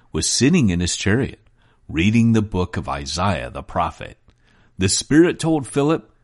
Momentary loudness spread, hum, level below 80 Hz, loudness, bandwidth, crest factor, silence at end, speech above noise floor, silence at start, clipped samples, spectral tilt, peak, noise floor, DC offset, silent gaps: 11 LU; none; -40 dBFS; -19 LUFS; 11.5 kHz; 18 dB; 0.2 s; 35 dB; 0.15 s; under 0.1%; -5 dB/octave; -2 dBFS; -54 dBFS; under 0.1%; none